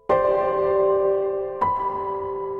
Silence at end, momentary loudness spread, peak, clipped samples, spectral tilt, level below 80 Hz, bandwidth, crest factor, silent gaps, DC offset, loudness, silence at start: 0 s; 8 LU; -8 dBFS; under 0.1%; -8.5 dB/octave; -52 dBFS; 4.5 kHz; 14 dB; none; under 0.1%; -22 LUFS; 0.1 s